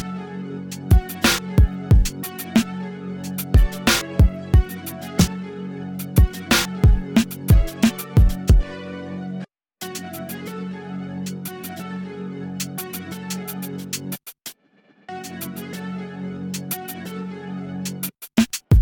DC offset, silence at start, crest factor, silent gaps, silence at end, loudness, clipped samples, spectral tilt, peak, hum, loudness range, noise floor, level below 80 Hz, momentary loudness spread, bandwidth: under 0.1%; 0 s; 16 dB; none; 0 s; -23 LUFS; under 0.1%; -5 dB/octave; -4 dBFS; none; 12 LU; -57 dBFS; -24 dBFS; 14 LU; 20 kHz